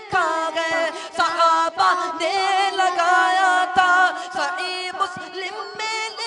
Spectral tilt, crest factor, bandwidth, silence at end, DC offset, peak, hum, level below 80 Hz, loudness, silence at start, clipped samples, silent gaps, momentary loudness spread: -1 dB/octave; 16 dB; 11 kHz; 0 s; under 0.1%; -4 dBFS; none; -66 dBFS; -20 LUFS; 0 s; under 0.1%; none; 9 LU